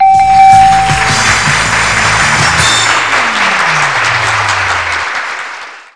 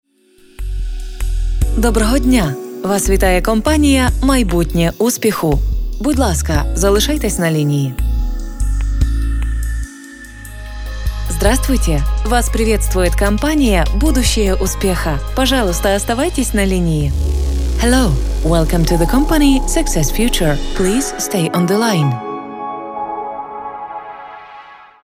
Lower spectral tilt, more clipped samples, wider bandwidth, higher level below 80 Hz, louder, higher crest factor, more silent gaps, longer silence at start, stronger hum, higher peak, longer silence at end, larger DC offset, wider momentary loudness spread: second, -2 dB/octave vs -5 dB/octave; first, 2% vs under 0.1%; second, 11 kHz vs 16.5 kHz; second, -32 dBFS vs -18 dBFS; first, -8 LUFS vs -16 LUFS; about the same, 10 dB vs 14 dB; neither; second, 0 s vs 0.6 s; neither; about the same, 0 dBFS vs 0 dBFS; about the same, 0.15 s vs 0.2 s; first, 1% vs under 0.1%; second, 10 LU vs 13 LU